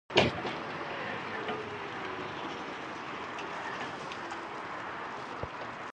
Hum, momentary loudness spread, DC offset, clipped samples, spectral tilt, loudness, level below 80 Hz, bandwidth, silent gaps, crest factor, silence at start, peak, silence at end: none; 5 LU; under 0.1%; under 0.1%; -4.5 dB/octave; -36 LUFS; -60 dBFS; 10.5 kHz; none; 28 dB; 0.1 s; -8 dBFS; 0 s